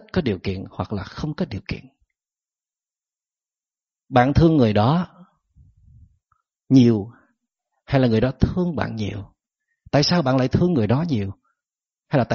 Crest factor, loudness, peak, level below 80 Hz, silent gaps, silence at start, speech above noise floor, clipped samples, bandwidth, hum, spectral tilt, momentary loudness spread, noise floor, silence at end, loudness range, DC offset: 18 dB; -20 LUFS; -4 dBFS; -42 dBFS; none; 0.15 s; over 71 dB; under 0.1%; 7 kHz; none; -6.5 dB/octave; 14 LU; under -90 dBFS; 0 s; 10 LU; under 0.1%